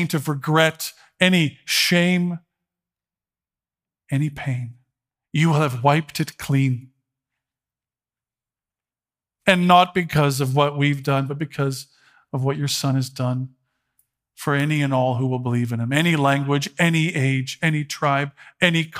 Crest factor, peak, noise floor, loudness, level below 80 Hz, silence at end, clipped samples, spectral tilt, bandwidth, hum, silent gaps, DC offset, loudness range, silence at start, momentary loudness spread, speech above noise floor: 22 dB; 0 dBFS; under -90 dBFS; -21 LUFS; -60 dBFS; 0 s; under 0.1%; -5.5 dB/octave; 16 kHz; none; none; under 0.1%; 6 LU; 0 s; 10 LU; over 70 dB